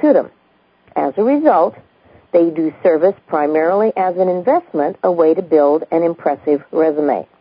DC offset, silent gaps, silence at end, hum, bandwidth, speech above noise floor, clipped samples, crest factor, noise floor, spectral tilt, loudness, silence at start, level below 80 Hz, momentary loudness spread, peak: under 0.1%; none; 0.15 s; none; 5.2 kHz; 40 dB; under 0.1%; 16 dB; -54 dBFS; -12.5 dB/octave; -15 LUFS; 0 s; -66 dBFS; 6 LU; 0 dBFS